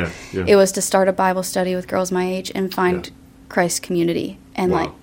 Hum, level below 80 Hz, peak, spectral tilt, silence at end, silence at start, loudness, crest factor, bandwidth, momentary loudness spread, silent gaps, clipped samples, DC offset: none; -50 dBFS; -2 dBFS; -4.5 dB/octave; 0.05 s; 0 s; -19 LUFS; 18 dB; 16.5 kHz; 10 LU; none; under 0.1%; under 0.1%